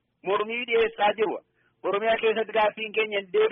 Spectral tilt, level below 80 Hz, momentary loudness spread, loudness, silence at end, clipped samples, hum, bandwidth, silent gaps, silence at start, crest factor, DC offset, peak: -0.5 dB/octave; -64 dBFS; 6 LU; -25 LUFS; 0 s; under 0.1%; none; 3.9 kHz; none; 0.25 s; 14 dB; under 0.1%; -12 dBFS